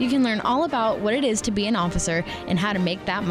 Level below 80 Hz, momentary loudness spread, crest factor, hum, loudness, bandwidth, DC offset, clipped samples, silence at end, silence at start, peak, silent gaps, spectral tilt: -42 dBFS; 4 LU; 10 dB; none; -23 LUFS; 13.5 kHz; under 0.1%; under 0.1%; 0 s; 0 s; -12 dBFS; none; -4.5 dB/octave